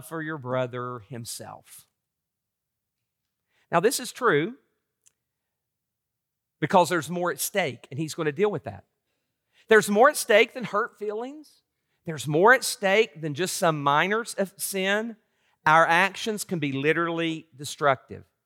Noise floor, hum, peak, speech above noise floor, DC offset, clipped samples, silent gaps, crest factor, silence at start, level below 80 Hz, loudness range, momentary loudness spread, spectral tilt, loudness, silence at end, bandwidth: -84 dBFS; none; -4 dBFS; 60 dB; under 0.1%; under 0.1%; none; 22 dB; 0.05 s; -76 dBFS; 6 LU; 16 LU; -4 dB/octave; -24 LUFS; 0.25 s; 17 kHz